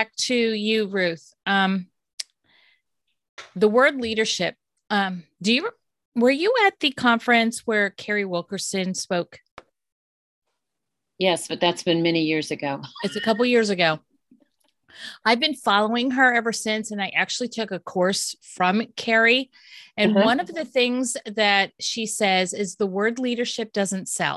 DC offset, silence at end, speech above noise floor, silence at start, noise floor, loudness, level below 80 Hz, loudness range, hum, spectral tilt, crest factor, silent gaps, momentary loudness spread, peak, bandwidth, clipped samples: under 0.1%; 0 s; 61 dB; 0 s; -84 dBFS; -22 LUFS; -68 dBFS; 5 LU; none; -3.5 dB/octave; 18 dB; 2.13-2.18 s, 3.29-3.38 s, 6.05-6.12 s, 9.51-9.57 s, 9.92-10.42 s; 11 LU; -4 dBFS; 12.5 kHz; under 0.1%